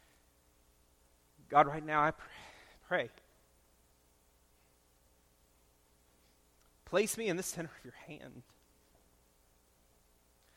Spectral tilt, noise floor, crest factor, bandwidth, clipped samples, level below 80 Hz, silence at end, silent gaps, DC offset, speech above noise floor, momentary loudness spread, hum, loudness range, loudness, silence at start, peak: -4 dB/octave; -69 dBFS; 28 dB; 17 kHz; under 0.1%; -70 dBFS; 2.15 s; none; under 0.1%; 35 dB; 25 LU; 60 Hz at -75 dBFS; 10 LU; -34 LUFS; 1.5 s; -12 dBFS